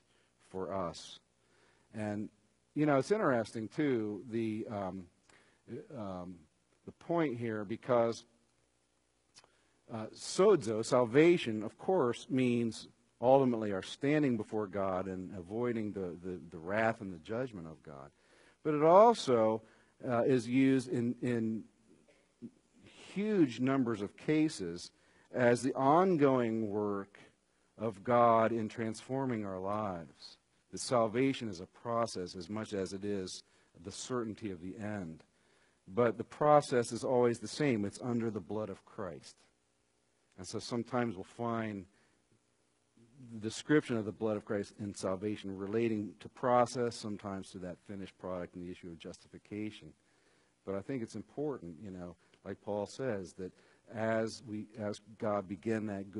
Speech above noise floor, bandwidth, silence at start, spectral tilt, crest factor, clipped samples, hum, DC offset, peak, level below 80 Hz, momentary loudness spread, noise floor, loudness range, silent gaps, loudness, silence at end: 42 dB; 11 kHz; 0.55 s; -6 dB/octave; 24 dB; under 0.1%; none; under 0.1%; -10 dBFS; -74 dBFS; 19 LU; -76 dBFS; 11 LU; none; -34 LUFS; 0 s